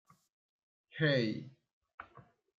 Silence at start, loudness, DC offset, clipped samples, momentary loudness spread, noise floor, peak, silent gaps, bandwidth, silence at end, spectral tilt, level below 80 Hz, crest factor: 0.95 s; -34 LUFS; under 0.1%; under 0.1%; 24 LU; -62 dBFS; -18 dBFS; 1.73-1.81 s, 1.94-1.98 s; 7.2 kHz; 0.4 s; -7 dB/octave; -78 dBFS; 22 dB